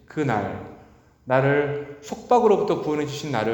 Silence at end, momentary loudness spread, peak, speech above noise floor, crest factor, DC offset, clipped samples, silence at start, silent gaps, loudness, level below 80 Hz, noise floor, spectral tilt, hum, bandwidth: 0 s; 17 LU; -4 dBFS; 29 dB; 18 dB; under 0.1%; under 0.1%; 0.1 s; none; -22 LUFS; -58 dBFS; -52 dBFS; -6.5 dB/octave; none; 19.5 kHz